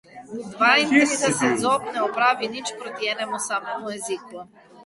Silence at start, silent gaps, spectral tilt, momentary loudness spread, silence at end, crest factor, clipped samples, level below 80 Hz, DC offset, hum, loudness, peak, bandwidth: 0.15 s; none; -2.5 dB/octave; 17 LU; 0.05 s; 20 dB; under 0.1%; -66 dBFS; under 0.1%; none; -22 LUFS; -4 dBFS; 11.5 kHz